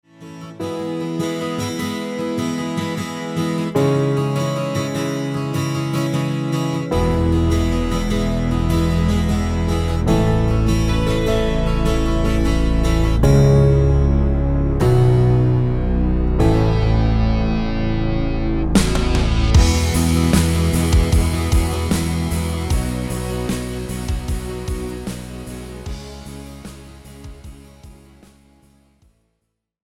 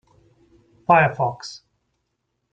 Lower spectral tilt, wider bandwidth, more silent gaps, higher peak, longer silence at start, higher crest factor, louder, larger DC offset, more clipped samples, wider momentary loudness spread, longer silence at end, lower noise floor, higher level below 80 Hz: about the same, -6.5 dB/octave vs -6 dB/octave; first, 16.5 kHz vs 9 kHz; neither; about the same, -2 dBFS vs -2 dBFS; second, 0.2 s vs 0.9 s; second, 16 dB vs 22 dB; about the same, -19 LUFS vs -19 LUFS; neither; neither; second, 13 LU vs 20 LU; first, 2 s vs 0.95 s; about the same, -74 dBFS vs -75 dBFS; first, -22 dBFS vs -58 dBFS